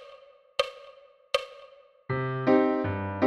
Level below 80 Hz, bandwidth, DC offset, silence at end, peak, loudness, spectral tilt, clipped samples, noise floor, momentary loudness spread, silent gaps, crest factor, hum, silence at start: -62 dBFS; 14 kHz; under 0.1%; 0 s; -10 dBFS; -28 LUFS; -6.5 dB/octave; under 0.1%; -53 dBFS; 19 LU; none; 20 dB; none; 0 s